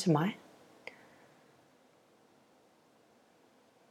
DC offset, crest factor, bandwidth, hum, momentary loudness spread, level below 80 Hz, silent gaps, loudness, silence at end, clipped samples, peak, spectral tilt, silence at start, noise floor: under 0.1%; 22 dB; 13 kHz; none; 30 LU; -90 dBFS; none; -37 LUFS; 3.55 s; under 0.1%; -16 dBFS; -7 dB/octave; 0 s; -66 dBFS